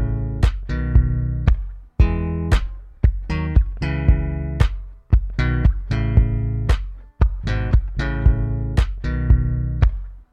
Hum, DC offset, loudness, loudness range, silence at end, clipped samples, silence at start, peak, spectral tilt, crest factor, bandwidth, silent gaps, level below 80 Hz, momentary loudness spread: none; under 0.1%; -21 LUFS; 1 LU; 0.1 s; under 0.1%; 0 s; -2 dBFS; -8 dB/octave; 16 dB; 7 kHz; none; -20 dBFS; 6 LU